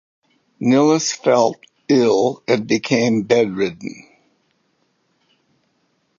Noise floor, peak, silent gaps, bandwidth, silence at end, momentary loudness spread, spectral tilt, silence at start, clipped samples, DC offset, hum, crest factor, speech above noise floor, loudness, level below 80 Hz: -66 dBFS; -2 dBFS; none; 7.6 kHz; 2.25 s; 9 LU; -5 dB/octave; 0.6 s; under 0.1%; under 0.1%; none; 18 dB; 49 dB; -17 LUFS; -64 dBFS